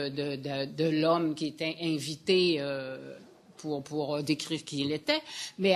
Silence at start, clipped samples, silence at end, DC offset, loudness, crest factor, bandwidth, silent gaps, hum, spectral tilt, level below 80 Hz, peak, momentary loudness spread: 0 s; under 0.1%; 0 s; under 0.1%; -31 LUFS; 20 dB; 13 kHz; none; none; -5 dB/octave; -74 dBFS; -10 dBFS; 12 LU